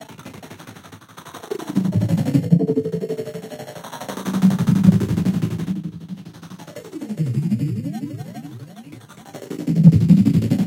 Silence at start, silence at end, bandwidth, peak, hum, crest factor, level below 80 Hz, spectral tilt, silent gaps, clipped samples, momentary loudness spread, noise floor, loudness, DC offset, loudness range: 0 s; 0 s; 16.5 kHz; 0 dBFS; none; 20 dB; -48 dBFS; -8 dB/octave; none; under 0.1%; 24 LU; -41 dBFS; -19 LUFS; under 0.1%; 8 LU